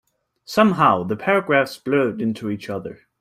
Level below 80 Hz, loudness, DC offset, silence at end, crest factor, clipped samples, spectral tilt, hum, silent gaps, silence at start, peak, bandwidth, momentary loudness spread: -62 dBFS; -20 LUFS; under 0.1%; 0.25 s; 18 dB; under 0.1%; -6.5 dB/octave; none; none; 0.5 s; -2 dBFS; 15 kHz; 13 LU